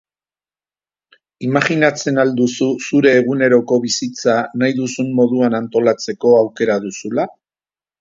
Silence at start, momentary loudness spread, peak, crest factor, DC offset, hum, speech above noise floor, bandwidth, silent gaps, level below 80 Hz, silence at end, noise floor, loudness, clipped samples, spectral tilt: 1.4 s; 7 LU; 0 dBFS; 16 dB; under 0.1%; none; over 75 dB; 7.8 kHz; none; -62 dBFS; 0.7 s; under -90 dBFS; -16 LUFS; under 0.1%; -5 dB/octave